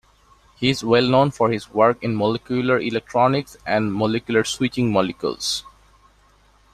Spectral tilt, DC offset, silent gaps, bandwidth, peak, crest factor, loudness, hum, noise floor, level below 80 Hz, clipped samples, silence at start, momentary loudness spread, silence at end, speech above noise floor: -5 dB/octave; under 0.1%; none; 13.5 kHz; -2 dBFS; 20 dB; -20 LUFS; none; -56 dBFS; -52 dBFS; under 0.1%; 0.6 s; 7 LU; 1.05 s; 36 dB